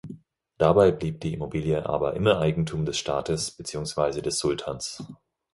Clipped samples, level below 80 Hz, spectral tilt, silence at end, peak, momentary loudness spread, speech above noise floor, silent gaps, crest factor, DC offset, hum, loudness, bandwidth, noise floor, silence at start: under 0.1%; -48 dBFS; -5 dB/octave; 0.4 s; -4 dBFS; 12 LU; 21 dB; none; 22 dB; under 0.1%; none; -25 LUFS; 11.5 kHz; -46 dBFS; 0.05 s